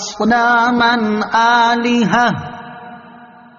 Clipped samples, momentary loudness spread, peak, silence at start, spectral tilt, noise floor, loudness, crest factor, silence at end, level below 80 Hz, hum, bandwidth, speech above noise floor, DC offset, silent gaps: under 0.1%; 19 LU; -2 dBFS; 0 s; -2.5 dB/octave; -40 dBFS; -13 LUFS; 14 dB; 0.35 s; -52 dBFS; none; 7.2 kHz; 27 dB; under 0.1%; none